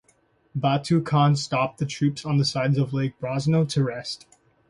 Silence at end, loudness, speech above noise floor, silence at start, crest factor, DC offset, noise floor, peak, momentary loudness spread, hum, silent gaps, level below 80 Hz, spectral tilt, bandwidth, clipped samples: 0.55 s; -24 LUFS; 41 dB; 0.55 s; 16 dB; under 0.1%; -63 dBFS; -8 dBFS; 8 LU; none; none; -58 dBFS; -6.5 dB/octave; 11 kHz; under 0.1%